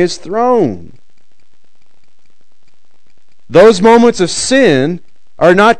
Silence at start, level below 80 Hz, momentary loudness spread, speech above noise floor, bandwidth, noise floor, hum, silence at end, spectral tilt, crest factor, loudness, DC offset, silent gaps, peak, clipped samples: 0 s; -46 dBFS; 11 LU; 51 dB; 12 kHz; -60 dBFS; none; 0.05 s; -4.5 dB/octave; 12 dB; -9 LUFS; 4%; none; 0 dBFS; 2%